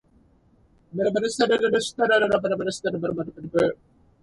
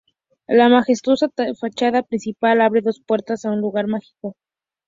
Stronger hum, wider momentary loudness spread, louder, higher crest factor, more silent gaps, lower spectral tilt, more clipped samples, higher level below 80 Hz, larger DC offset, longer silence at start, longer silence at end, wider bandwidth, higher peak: neither; second, 9 LU vs 12 LU; second, -23 LUFS vs -18 LUFS; about the same, 16 dB vs 18 dB; neither; about the same, -4.5 dB/octave vs -5.5 dB/octave; neither; first, -58 dBFS vs -64 dBFS; neither; first, 0.95 s vs 0.5 s; about the same, 0.5 s vs 0.55 s; first, 11.5 kHz vs 7.6 kHz; second, -8 dBFS vs -2 dBFS